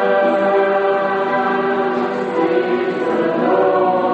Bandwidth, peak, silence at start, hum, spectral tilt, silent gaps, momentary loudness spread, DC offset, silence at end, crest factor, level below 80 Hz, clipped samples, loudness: 8.2 kHz; -4 dBFS; 0 s; none; -7 dB/octave; none; 4 LU; under 0.1%; 0 s; 12 dB; -62 dBFS; under 0.1%; -16 LUFS